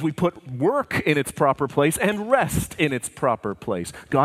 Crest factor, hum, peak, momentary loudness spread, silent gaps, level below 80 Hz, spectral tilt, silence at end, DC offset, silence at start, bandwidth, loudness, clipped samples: 18 dB; none; -4 dBFS; 7 LU; none; -46 dBFS; -5 dB/octave; 0 s; under 0.1%; 0 s; 16 kHz; -23 LUFS; under 0.1%